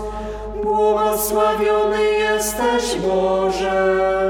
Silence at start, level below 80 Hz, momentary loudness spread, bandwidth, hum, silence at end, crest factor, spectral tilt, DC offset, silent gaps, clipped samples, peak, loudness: 0 s; -38 dBFS; 5 LU; 19 kHz; 50 Hz at -40 dBFS; 0 s; 12 dB; -3.5 dB/octave; under 0.1%; none; under 0.1%; -6 dBFS; -18 LUFS